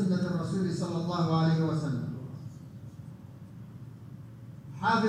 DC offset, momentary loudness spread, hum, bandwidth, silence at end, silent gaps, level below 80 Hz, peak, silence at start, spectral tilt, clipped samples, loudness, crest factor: under 0.1%; 20 LU; none; 10 kHz; 0 s; none; -64 dBFS; -14 dBFS; 0 s; -7.5 dB/octave; under 0.1%; -30 LUFS; 16 dB